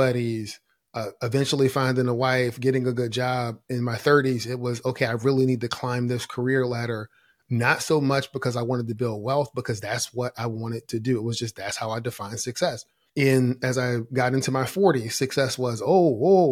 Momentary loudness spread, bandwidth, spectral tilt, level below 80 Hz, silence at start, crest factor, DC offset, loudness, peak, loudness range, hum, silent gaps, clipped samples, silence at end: 10 LU; 16 kHz; -5.5 dB/octave; -64 dBFS; 0 s; 18 dB; under 0.1%; -24 LUFS; -6 dBFS; 5 LU; none; none; under 0.1%; 0 s